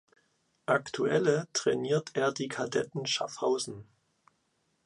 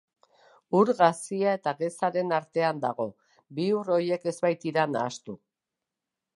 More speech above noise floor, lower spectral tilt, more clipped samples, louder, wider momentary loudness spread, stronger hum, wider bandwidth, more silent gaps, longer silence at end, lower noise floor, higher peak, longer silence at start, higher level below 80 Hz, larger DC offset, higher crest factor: second, 45 dB vs 61 dB; second, -4 dB/octave vs -5.5 dB/octave; neither; second, -30 LUFS vs -27 LUFS; second, 7 LU vs 11 LU; neither; about the same, 11.5 kHz vs 11.5 kHz; neither; about the same, 1 s vs 1 s; second, -75 dBFS vs -88 dBFS; second, -12 dBFS vs -6 dBFS; about the same, 0.7 s vs 0.7 s; first, -72 dBFS vs -78 dBFS; neither; about the same, 20 dB vs 22 dB